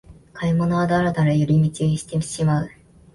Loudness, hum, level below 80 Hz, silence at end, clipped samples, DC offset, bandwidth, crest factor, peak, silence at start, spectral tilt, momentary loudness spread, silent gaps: -21 LUFS; none; -46 dBFS; 0.45 s; under 0.1%; under 0.1%; 11.5 kHz; 12 dB; -8 dBFS; 0.1 s; -7 dB/octave; 7 LU; none